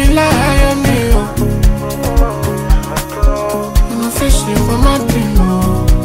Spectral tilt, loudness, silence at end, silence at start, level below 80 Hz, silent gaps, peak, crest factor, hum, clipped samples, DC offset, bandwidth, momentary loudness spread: -5.5 dB/octave; -13 LUFS; 0 s; 0 s; -14 dBFS; none; 0 dBFS; 10 dB; none; under 0.1%; under 0.1%; 16.5 kHz; 5 LU